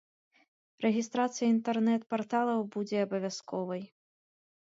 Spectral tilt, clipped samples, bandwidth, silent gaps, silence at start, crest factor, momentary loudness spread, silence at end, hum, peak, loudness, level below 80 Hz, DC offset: -5.5 dB/octave; under 0.1%; 7.8 kHz; none; 0.8 s; 16 dB; 8 LU; 0.85 s; none; -16 dBFS; -31 LUFS; -82 dBFS; under 0.1%